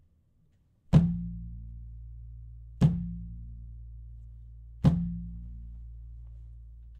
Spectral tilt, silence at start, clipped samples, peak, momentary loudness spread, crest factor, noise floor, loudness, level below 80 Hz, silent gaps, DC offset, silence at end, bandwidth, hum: -9.5 dB/octave; 0.9 s; under 0.1%; -8 dBFS; 24 LU; 24 dB; -66 dBFS; -29 LUFS; -42 dBFS; none; under 0.1%; 0 s; 8.2 kHz; none